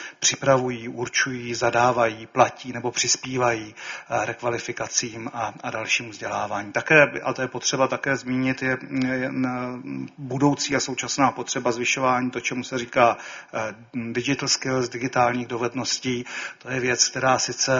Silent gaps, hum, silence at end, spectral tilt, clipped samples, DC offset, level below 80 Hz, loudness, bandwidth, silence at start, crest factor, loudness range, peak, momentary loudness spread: none; none; 0 s; -3 dB/octave; under 0.1%; under 0.1%; -60 dBFS; -23 LUFS; 7.6 kHz; 0 s; 22 dB; 3 LU; -2 dBFS; 11 LU